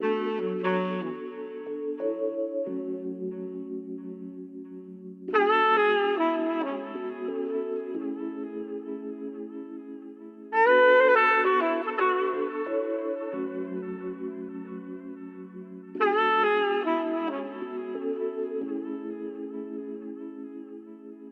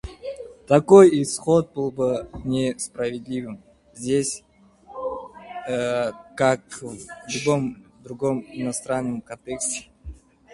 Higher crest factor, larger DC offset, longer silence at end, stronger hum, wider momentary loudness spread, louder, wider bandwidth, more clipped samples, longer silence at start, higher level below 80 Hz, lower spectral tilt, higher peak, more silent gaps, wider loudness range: about the same, 18 dB vs 22 dB; neither; second, 0 s vs 0.4 s; neither; first, 20 LU vs 17 LU; second, -27 LUFS vs -22 LUFS; second, 6.4 kHz vs 11.5 kHz; neither; about the same, 0 s vs 0.05 s; second, -82 dBFS vs -50 dBFS; first, -7 dB/octave vs -5 dB/octave; second, -10 dBFS vs 0 dBFS; neither; about the same, 11 LU vs 9 LU